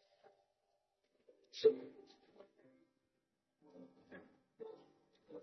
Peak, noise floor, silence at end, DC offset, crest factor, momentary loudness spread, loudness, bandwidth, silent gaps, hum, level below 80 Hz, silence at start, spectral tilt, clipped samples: -20 dBFS; -87 dBFS; 0 s; under 0.1%; 26 dB; 27 LU; -36 LUFS; 6 kHz; none; none; under -90 dBFS; 1.55 s; -3 dB/octave; under 0.1%